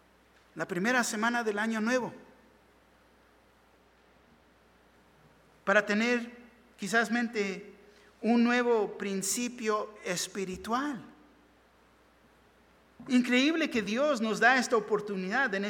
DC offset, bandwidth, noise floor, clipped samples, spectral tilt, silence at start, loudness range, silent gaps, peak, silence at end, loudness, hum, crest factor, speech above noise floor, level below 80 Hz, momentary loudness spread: under 0.1%; 17.5 kHz; -63 dBFS; under 0.1%; -3.5 dB/octave; 0.55 s; 8 LU; none; -8 dBFS; 0 s; -29 LUFS; none; 22 dB; 34 dB; -70 dBFS; 12 LU